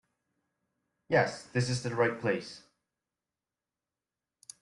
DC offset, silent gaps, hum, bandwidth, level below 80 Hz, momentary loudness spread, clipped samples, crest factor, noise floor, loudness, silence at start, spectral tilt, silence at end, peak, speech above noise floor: under 0.1%; none; none; 11.5 kHz; -70 dBFS; 19 LU; under 0.1%; 22 dB; under -90 dBFS; -31 LUFS; 1.1 s; -5.5 dB/octave; 2 s; -12 dBFS; over 60 dB